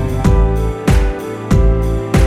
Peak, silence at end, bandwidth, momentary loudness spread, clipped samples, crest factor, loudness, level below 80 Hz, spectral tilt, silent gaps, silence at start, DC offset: 0 dBFS; 0 s; 14 kHz; 4 LU; under 0.1%; 12 dB; -15 LUFS; -16 dBFS; -7 dB/octave; none; 0 s; under 0.1%